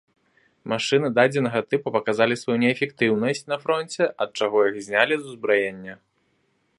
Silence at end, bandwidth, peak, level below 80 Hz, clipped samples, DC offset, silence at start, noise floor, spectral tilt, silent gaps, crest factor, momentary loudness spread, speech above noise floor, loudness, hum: 0.85 s; 11.5 kHz; -2 dBFS; -70 dBFS; under 0.1%; under 0.1%; 0.65 s; -68 dBFS; -5 dB/octave; none; 22 dB; 7 LU; 46 dB; -22 LUFS; none